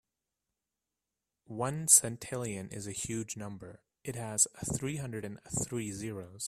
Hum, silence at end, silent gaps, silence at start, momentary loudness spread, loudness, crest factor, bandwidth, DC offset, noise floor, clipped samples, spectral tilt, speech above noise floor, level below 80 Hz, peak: none; 0 s; none; 1.5 s; 20 LU; -31 LUFS; 28 dB; 15.5 kHz; under 0.1%; -89 dBFS; under 0.1%; -3.5 dB/octave; 55 dB; -62 dBFS; -8 dBFS